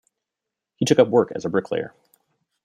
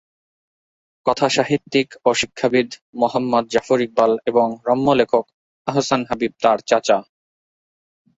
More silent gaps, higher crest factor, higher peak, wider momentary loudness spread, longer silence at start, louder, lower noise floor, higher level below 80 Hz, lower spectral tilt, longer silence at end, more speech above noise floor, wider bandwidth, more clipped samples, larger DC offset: second, none vs 2.82-2.93 s, 5.34-5.65 s; about the same, 20 dB vs 18 dB; about the same, -2 dBFS vs -2 dBFS; first, 12 LU vs 5 LU; second, 0.8 s vs 1.05 s; about the same, -21 LUFS vs -19 LUFS; second, -85 dBFS vs under -90 dBFS; second, -64 dBFS vs -58 dBFS; about the same, -5.5 dB/octave vs -4.5 dB/octave; second, 0.75 s vs 1.15 s; second, 65 dB vs over 72 dB; first, 13.5 kHz vs 8 kHz; neither; neither